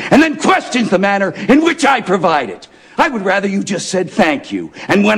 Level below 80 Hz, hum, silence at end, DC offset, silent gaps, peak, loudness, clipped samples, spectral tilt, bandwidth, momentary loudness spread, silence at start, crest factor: -48 dBFS; none; 0 s; under 0.1%; none; -2 dBFS; -14 LUFS; under 0.1%; -4.5 dB/octave; 13.5 kHz; 10 LU; 0 s; 12 dB